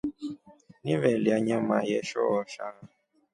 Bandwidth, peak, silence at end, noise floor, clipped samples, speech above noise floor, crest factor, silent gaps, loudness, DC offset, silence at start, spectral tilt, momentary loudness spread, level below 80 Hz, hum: 11 kHz; -10 dBFS; 0.5 s; -56 dBFS; under 0.1%; 29 dB; 20 dB; none; -28 LUFS; under 0.1%; 0.05 s; -6.5 dB/octave; 15 LU; -66 dBFS; none